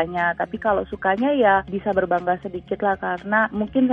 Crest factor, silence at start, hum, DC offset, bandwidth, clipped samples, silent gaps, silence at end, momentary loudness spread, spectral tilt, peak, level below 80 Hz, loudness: 16 dB; 0 s; none; under 0.1%; 5.2 kHz; under 0.1%; none; 0 s; 7 LU; -8.5 dB/octave; -6 dBFS; -48 dBFS; -22 LUFS